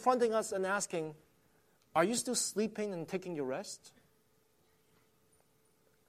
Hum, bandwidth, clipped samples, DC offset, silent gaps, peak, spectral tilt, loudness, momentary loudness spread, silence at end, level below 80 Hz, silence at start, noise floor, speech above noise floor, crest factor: none; 15.5 kHz; under 0.1%; under 0.1%; none; -16 dBFS; -3.5 dB/octave; -35 LUFS; 10 LU; 2.2 s; -80 dBFS; 0 s; -72 dBFS; 38 dB; 22 dB